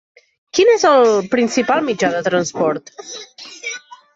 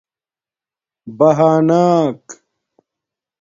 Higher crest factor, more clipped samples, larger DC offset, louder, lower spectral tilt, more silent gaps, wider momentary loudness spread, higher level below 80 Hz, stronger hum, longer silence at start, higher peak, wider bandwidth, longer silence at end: about the same, 14 dB vs 16 dB; neither; neither; about the same, -15 LUFS vs -13 LUFS; second, -4 dB/octave vs -7.5 dB/octave; neither; first, 20 LU vs 9 LU; about the same, -62 dBFS vs -62 dBFS; neither; second, 0.55 s vs 1.05 s; about the same, -2 dBFS vs 0 dBFS; about the same, 7.8 kHz vs 7.6 kHz; second, 0.2 s vs 1.1 s